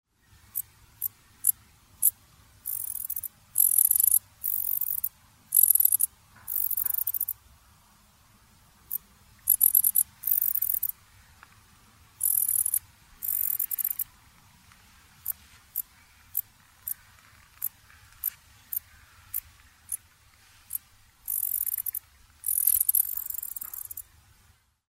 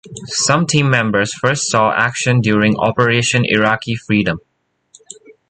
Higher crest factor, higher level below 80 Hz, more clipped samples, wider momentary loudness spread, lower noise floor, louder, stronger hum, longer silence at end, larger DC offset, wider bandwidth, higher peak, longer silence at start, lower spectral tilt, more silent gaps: first, 30 dB vs 14 dB; second, -64 dBFS vs -48 dBFS; neither; first, 17 LU vs 4 LU; first, -63 dBFS vs -51 dBFS; second, -25 LUFS vs -15 LUFS; neither; second, 0.85 s vs 1.1 s; neither; first, 16.5 kHz vs 9.4 kHz; about the same, 0 dBFS vs 0 dBFS; first, 0.55 s vs 0.05 s; second, 1 dB/octave vs -4.5 dB/octave; neither